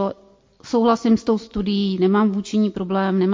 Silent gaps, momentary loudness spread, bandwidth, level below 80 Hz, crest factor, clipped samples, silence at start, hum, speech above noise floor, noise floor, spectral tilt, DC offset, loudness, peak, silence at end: none; 5 LU; 7.6 kHz; -50 dBFS; 14 dB; under 0.1%; 0 s; none; 33 dB; -52 dBFS; -7 dB/octave; under 0.1%; -20 LUFS; -6 dBFS; 0 s